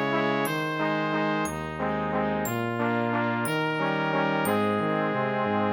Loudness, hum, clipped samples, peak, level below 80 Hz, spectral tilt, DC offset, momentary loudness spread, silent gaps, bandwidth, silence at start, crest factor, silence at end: -26 LUFS; none; under 0.1%; -12 dBFS; -56 dBFS; -5.5 dB/octave; under 0.1%; 3 LU; none; 19 kHz; 0 s; 16 dB; 0 s